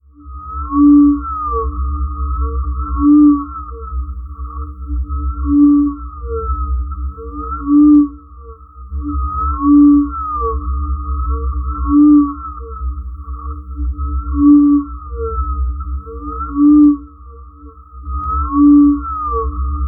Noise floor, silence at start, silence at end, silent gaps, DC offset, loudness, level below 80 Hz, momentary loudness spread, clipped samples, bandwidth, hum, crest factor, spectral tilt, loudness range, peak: -37 dBFS; 0.2 s; 0 s; none; under 0.1%; -14 LUFS; -22 dBFS; 19 LU; under 0.1%; 1.5 kHz; none; 14 dB; -16 dB/octave; 3 LU; 0 dBFS